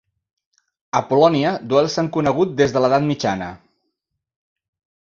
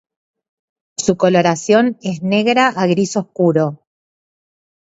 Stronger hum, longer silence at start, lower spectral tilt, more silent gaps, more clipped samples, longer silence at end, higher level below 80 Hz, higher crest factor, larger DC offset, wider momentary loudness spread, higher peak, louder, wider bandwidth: neither; about the same, 0.95 s vs 1 s; about the same, -6 dB/octave vs -5 dB/octave; neither; neither; first, 1.5 s vs 1.1 s; about the same, -54 dBFS vs -58 dBFS; about the same, 18 dB vs 16 dB; neither; about the same, 8 LU vs 7 LU; about the same, -2 dBFS vs 0 dBFS; second, -18 LUFS vs -15 LUFS; about the same, 7.4 kHz vs 8 kHz